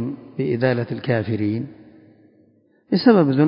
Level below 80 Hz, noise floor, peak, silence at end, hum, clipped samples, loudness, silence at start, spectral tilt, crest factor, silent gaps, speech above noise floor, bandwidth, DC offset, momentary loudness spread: -56 dBFS; -57 dBFS; -2 dBFS; 0 s; none; under 0.1%; -20 LUFS; 0 s; -12 dB/octave; 18 dB; none; 39 dB; 5.4 kHz; under 0.1%; 13 LU